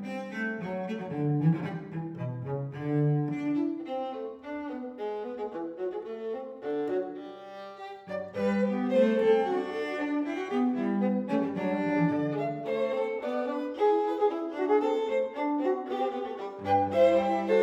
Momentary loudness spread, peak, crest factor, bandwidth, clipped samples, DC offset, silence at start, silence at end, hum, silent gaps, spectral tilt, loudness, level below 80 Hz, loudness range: 12 LU; -12 dBFS; 18 dB; 8.6 kHz; under 0.1%; under 0.1%; 0 s; 0 s; none; none; -8.5 dB/octave; -30 LUFS; -74 dBFS; 8 LU